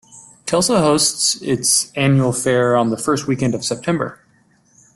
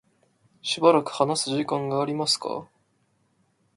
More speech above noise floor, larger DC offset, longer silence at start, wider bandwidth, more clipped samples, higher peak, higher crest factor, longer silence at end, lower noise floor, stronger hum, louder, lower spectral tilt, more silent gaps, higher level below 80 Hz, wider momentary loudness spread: second, 39 dB vs 45 dB; neither; second, 0.15 s vs 0.65 s; about the same, 12.5 kHz vs 11.5 kHz; neither; about the same, -2 dBFS vs -4 dBFS; second, 16 dB vs 24 dB; second, 0.8 s vs 1.15 s; second, -56 dBFS vs -68 dBFS; neither; first, -17 LUFS vs -24 LUFS; about the same, -4 dB/octave vs -4 dB/octave; neither; first, -52 dBFS vs -72 dBFS; second, 7 LU vs 13 LU